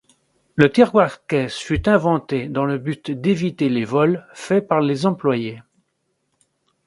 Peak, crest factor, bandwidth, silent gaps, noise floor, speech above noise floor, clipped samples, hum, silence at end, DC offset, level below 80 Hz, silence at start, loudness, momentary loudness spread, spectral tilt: 0 dBFS; 20 dB; 11.5 kHz; none; -71 dBFS; 53 dB; under 0.1%; none; 1.25 s; under 0.1%; -44 dBFS; 0.55 s; -19 LUFS; 9 LU; -7 dB/octave